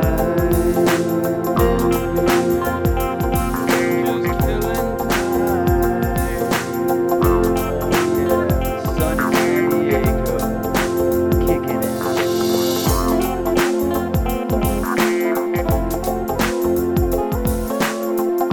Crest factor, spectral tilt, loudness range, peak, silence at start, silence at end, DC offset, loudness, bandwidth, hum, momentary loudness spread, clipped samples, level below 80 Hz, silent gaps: 12 dB; -6 dB/octave; 1 LU; -6 dBFS; 0 s; 0 s; under 0.1%; -19 LUFS; 19 kHz; none; 4 LU; under 0.1%; -28 dBFS; none